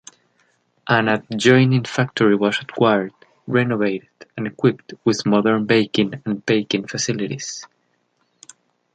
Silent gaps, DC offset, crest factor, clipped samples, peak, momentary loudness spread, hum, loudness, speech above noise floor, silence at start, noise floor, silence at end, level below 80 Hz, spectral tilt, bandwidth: none; under 0.1%; 20 dB; under 0.1%; -2 dBFS; 13 LU; none; -19 LUFS; 48 dB; 0.85 s; -67 dBFS; 1.3 s; -62 dBFS; -5.5 dB/octave; 9.2 kHz